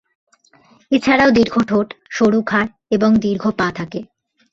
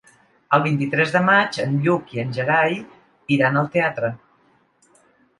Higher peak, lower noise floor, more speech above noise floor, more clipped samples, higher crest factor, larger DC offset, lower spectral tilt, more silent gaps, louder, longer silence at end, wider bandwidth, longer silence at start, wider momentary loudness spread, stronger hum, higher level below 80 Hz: about the same, -2 dBFS vs -2 dBFS; second, -52 dBFS vs -60 dBFS; about the same, 37 dB vs 40 dB; neither; about the same, 16 dB vs 20 dB; neither; about the same, -6 dB/octave vs -6.5 dB/octave; neither; first, -16 LUFS vs -20 LUFS; second, 0.5 s vs 1.25 s; second, 7.6 kHz vs 11.5 kHz; first, 0.9 s vs 0.5 s; about the same, 11 LU vs 11 LU; neither; first, -50 dBFS vs -64 dBFS